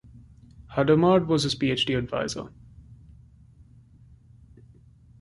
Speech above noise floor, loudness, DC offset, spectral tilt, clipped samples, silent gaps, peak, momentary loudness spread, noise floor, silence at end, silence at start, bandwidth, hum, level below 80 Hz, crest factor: 30 dB; -24 LUFS; under 0.1%; -5.5 dB/octave; under 0.1%; none; -8 dBFS; 13 LU; -53 dBFS; 2.25 s; 0.15 s; 11.5 kHz; none; -52 dBFS; 20 dB